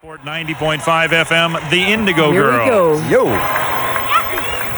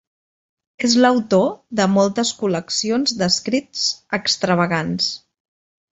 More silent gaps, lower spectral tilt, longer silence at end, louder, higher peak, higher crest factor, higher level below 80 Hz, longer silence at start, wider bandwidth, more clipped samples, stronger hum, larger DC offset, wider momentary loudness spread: neither; about the same, -4.5 dB/octave vs -4 dB/octave; second, 0 s vs 0.75 s; first, -14 LUFS vs -18 LUFS; about the same, -2 dBFS vs -2 dBFS; about the same, 14 dB vs 18 dB; first, -42 dBFS vs -58 dBFS; second, 0.05 s vs 0.8 s; first, over 20 kHz vs 8.2 kHz; neither; neither; neither; about the same, 6 LU vs 7 LU